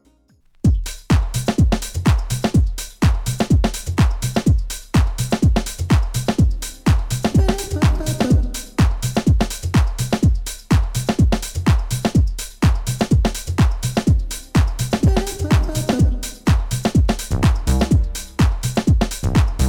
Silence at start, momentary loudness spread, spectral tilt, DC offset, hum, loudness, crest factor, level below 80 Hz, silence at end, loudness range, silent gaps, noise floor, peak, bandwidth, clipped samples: 0.65 s; 3 LU; -6 dB/octave; under 0.1%; none; -19 LUFS; 14 dB; -22 dBFS; 0 s; 1 LU; none; -55 dBFS; -4 dBFS; 18.5 kHz; under 0.1%